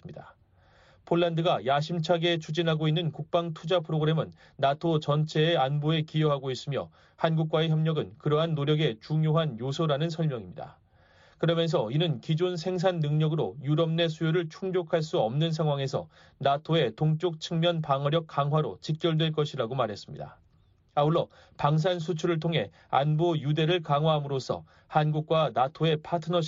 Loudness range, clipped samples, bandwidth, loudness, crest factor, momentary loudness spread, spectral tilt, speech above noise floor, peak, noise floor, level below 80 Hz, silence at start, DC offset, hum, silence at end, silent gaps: 2 LU; under 0.1%; 7.6 kHz; -28 LUFS; 18 dB; 7 LU; -5.5 dB/octave; 36 dB; -10 dBFS; -63 dBFS; -66 dBFS; 0.05 s; under 0.1%; none; 0 s; none